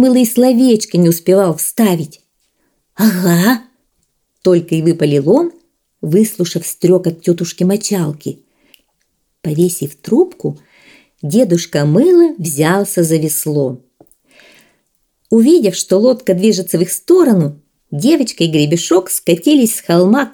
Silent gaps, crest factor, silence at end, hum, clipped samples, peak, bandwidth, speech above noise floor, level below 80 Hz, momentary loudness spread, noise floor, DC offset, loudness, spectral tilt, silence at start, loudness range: none; 14 dB; 0.05 s; none; under 0.1%; 0 dBFS; 20 kHz; 53 dB; -60 dBFS; 10 LU; -65 dBFS; under 0.1%; -13 LUFS; -5.5 dB/octave; 0 s; 5 LU